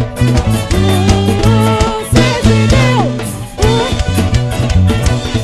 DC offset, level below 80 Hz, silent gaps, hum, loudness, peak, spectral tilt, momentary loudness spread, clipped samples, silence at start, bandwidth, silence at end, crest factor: under 0.1%; -18 dBFS; none; none; -12 LUFS; 0 dBFS; -6 dB/octave; 4 LU; under 0.1%; 0 s; 14 kHz; 0 s; 10 dB